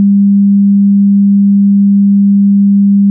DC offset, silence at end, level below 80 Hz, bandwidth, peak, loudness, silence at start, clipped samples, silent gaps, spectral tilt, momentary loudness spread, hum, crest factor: under 0.1%; 0 s; -66 dBFS; 0.3 kHz; -4 dBFS; -7 LUFS; 0 s; under 0.1%; none; -20.5 dB/octave; 0 LU; none; 4 dB